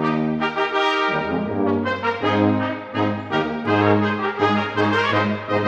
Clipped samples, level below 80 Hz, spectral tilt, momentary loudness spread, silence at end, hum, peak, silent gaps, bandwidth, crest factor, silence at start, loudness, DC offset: under 0.1%; -56 dBFS; -7 dB/octave; 5 LU; 0 s; none; -4 dBFS; none; 8.4 kHz; 16 dB; 0 s; -20 LUFS; under 0.1%